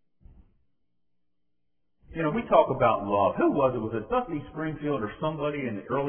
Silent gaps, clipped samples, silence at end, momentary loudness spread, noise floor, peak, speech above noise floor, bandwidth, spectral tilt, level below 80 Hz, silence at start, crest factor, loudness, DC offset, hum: none; under 0.1%; 0 s; 10 LU; -83 dBFS; -6 dBFS; 56 dB; 3.5 kHz; -11 dB/octave; -54 dBFS; 2.1 s; 22 dB; -27 LUFS; under 0.1%; none